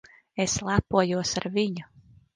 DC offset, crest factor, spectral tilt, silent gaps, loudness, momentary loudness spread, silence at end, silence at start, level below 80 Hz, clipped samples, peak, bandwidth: under 0.1%; 22 dB; -4.5 dB/octave; none; -26 LUFS; 9 LU; 0.5 s; 0.35 s; -46 dBFS; under 0.1%; -6 dBFS; 10.5 kHz